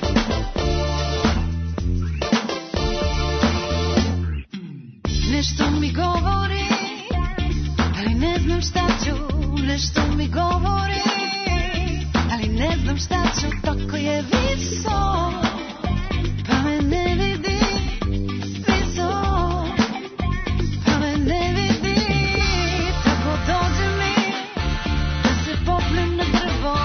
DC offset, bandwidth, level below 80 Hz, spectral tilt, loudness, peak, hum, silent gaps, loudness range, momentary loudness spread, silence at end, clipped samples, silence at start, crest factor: under 0.1%; 6.6 kHz; -28 dBFS; -5 dB/octave; -22 LUFS; -4 dBFS; none; none; 2 LU; 5 LU; 0 s; under 0.1%; 0 s; 16 dB